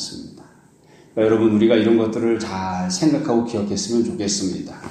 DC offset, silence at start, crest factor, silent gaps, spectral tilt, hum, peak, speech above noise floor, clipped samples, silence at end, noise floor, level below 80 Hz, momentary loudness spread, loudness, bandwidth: under 0.1%; 0 s; 16 dB; none; -5 dB/octave; none; -4 dBFS; 31 dB; under 0.1%; 0 s; -50 dBFS; -56 dBFS; 11 LU; -19 LUFS; 10.5 kHz